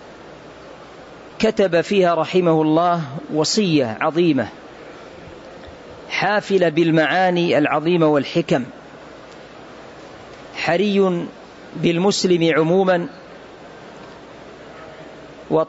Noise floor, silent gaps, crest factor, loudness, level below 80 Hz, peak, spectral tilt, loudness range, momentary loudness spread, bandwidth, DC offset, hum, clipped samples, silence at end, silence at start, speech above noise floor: -40 dBFS; none; 16 dB; -18 LUFS; -58 dBFS; -4 dBFS; -5.5 dB/octave; 5 LU; 23 LU; 8 kHz; under 0.1%; none; under 0.1%; 0.05 s; 0 s; 22 dB